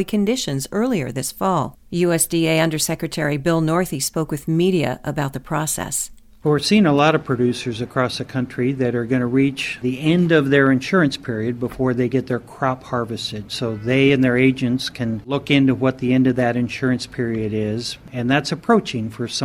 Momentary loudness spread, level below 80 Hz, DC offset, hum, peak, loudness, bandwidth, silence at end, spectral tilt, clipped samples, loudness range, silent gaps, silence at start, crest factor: 9 LU; -48 dBFS; under 0.1%; none; -2 dBFS; -20 LUFS; 17.5 kHz; 0 s; -5 dB/octave; under 0.1%; 3 LU; none; 0 s; 18 dB